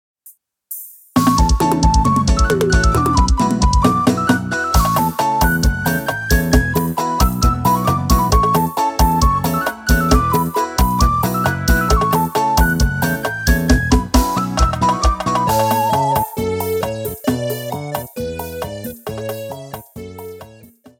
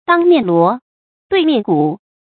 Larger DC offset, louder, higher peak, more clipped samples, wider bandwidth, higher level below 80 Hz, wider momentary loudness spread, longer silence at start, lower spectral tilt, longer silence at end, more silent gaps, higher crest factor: neither; about the same, -16 LUFS vs -14 LUFS; about the same, 0 dBFS vs 0 dBFS; neither; first, 18 kHz vs 4.5 kHz; first, -22 dBFS vs -60 dBFS; first, 12 LU vs 8 LU; first, 0.25 s vs 0.1 s; second, -5 dB/octave vs -11.5 dB/octave; first, 0.5 s vs 0.3 s; second, none vs 0.82-1.30 s; about the same, 16 dB vs 14 dB